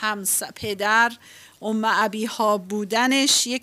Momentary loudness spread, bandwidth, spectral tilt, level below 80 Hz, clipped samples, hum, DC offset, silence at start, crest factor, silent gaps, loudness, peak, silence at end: 8 LU; 16 kHz; -1.5 dB/octave; -66 dBFS; under 0.1%; none; under 0.1%; 0 s; 16 dB; none; -21 LUFS; -6 dBFS; 0.05 s